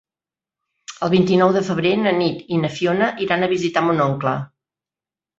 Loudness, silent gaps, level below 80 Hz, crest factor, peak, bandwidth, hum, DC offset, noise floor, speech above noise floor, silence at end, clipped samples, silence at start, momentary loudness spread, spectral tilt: -19 LUFS; none; -60 dBFS; 18 dB; -2 dBFS; 7.8 kHz; none; under 0.1%; under -90 dBFS; over 72 dB; 0.9 s; under 0.1%; 0.9 s; 8 LU; -6.5 dB/octave